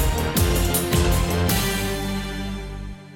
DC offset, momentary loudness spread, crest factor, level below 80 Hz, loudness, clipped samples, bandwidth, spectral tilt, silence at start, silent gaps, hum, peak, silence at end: under 0.1%; 11 LU; 14 dB; -28 dBFS; -22 LUFS; under 0.1%; 17.5 kHz; -4.5 dB/octave; 0 s; none; 50 Hz at -40 dBFS; -8 dBFS; 0 s